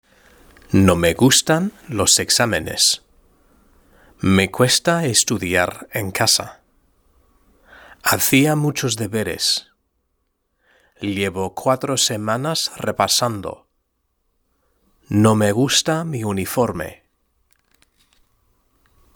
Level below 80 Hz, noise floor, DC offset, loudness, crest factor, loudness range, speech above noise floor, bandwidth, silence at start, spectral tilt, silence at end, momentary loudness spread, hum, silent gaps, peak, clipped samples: -50 dBFS; -70 dBFS; under 0.1%; -18 LUFS; 20 dB; 6 LU; 52 dB; over 20 kHz; 0.7 s; -3.5 dB/octave; 2.25 s; 9 LU; none; none; 0 dBFS; under 0.1%